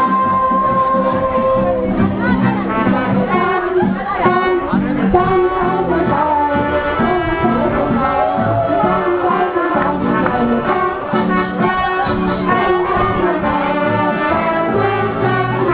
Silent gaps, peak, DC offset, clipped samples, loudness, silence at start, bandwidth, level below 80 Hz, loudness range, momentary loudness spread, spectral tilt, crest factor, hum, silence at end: none; 0 dBFS; under 0.1%; under 0.1%; -15 LUFS; 0 s; 4 kHz; -36 dBFS; 1 LU; 2 LU; -10.5 dB/octave; 14 dB; none; 0 s